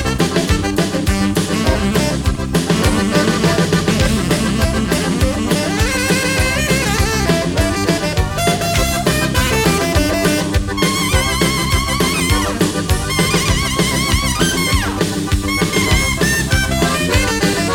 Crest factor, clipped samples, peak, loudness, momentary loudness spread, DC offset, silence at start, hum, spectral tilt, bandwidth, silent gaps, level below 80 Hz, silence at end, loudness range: 14 dB; under 0.1%; 0 dBFS; -15 LUFS; 3 LU; under 0.1%; 0 s; none; -4 dB/octave; 18.5 kHz; none; -24 dBFS; 0 s; 1 LU